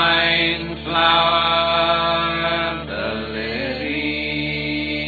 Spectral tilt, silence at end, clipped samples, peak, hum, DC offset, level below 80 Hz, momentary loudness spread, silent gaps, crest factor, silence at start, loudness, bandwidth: -6.5 dB/octave; 0 s; under 0.1%; -2 dBFS; none; under 0.1%; -40 dBFS; 10 LU; none; 18 dB; 0 s; -19 LUFS; 4.8 kHz